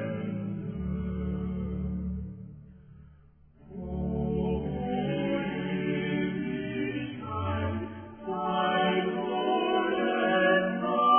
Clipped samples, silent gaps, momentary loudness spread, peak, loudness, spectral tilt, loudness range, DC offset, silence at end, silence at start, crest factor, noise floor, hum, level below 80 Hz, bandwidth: under 0.1%; none; 11 LU; -12 dBFS; -30 LUFS; -10.5 dB/octave; 9 LU; under 0.1%; 0 s; 0 s; 18 dB; -57 dBFS; none; -46 dBFS; 3.5 kHz